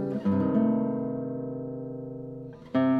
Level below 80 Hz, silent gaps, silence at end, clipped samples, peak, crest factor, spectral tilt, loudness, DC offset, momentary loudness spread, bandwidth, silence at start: -64 dBFS; none; 0 s; under 0.1%; -12 dBFS; 16 dB; -10.5 dB/octave; -29 LUFS; under 0.1%; 14 LU; 4.8 kHz; 0 s